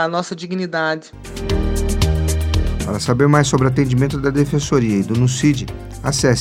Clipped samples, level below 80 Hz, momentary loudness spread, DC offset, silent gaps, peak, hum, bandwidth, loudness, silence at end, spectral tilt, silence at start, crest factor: under 0.1%; -26 dBFS; 10 LU; under 0.1%; none; 0 dBFS; none; 16 kHz; -18 LUFS; 0 s; -5.5 dB/octave; 0 s; 16 dB